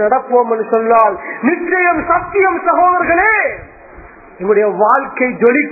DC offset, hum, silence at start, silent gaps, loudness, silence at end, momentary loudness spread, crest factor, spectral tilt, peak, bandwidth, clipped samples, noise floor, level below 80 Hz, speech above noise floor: under 0.1%; none; 0 s; none; -13 LUFS; 0 s; 6 LU; 14 dB; -10.5 dB/octave; 0 dBFS; 2.7 kHz; under 0.1%; -37 dBFS; -44 dBFS; 24 dB